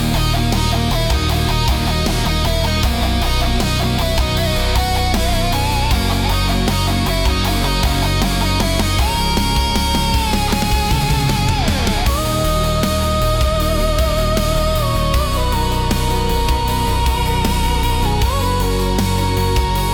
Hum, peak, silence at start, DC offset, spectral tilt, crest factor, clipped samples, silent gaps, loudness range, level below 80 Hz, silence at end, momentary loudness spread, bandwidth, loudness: none; -6 dBFS; 0 s; under 0.1%; -4.5 dB/octave; 10 dB; under 0.1%; none; 1 LU; -20 dBFS; 0 s; 1 LU; 18 kHz; -17 LUFS